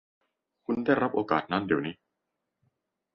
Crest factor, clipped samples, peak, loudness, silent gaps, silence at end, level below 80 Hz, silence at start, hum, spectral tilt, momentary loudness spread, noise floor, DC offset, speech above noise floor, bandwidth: 22 dB; under 0.1%; -10 dBFS; -28 LUFS; none; 1.2 s; -66 dBFS; 0.7 s; none; -9 dB/octave; 10 LU; -84 dBFS; under 0.1%; 56 dB; 5.8 kHz